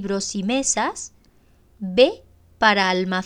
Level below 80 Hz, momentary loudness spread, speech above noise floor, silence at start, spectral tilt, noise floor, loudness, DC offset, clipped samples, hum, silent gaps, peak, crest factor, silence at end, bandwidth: -54 dBFS; 17 LU; 35 dB; 0 s; -3 dB/octave; -55 dBFS; -20 LUFS; under 0.1%; under 0.1%; none; none; -2 dBFS; 20 dB; 0 s; 10.5 kHz